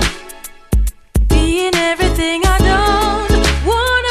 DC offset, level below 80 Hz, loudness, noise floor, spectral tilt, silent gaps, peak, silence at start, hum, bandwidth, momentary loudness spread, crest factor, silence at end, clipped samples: under 0.1%; -18 dBFS; -15 LUFS; -34 dBFS; -4.5 dB/octave; none; 0 dBFS; 0 s; none; 15.5 kHz; 8 LU; 14 dB; 0 s; under 0.1%